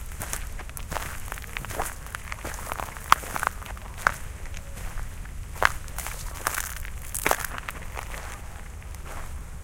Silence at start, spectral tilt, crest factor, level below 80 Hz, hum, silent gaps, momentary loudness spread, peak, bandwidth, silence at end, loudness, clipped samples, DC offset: 0 s; -2.5 dB/octave; 32 dB; -38 dBFS; none; none; 14 LU; 0 dBFS; 17 kHz; 0 s; -31 LUFS; under 0.1%; under 0.1%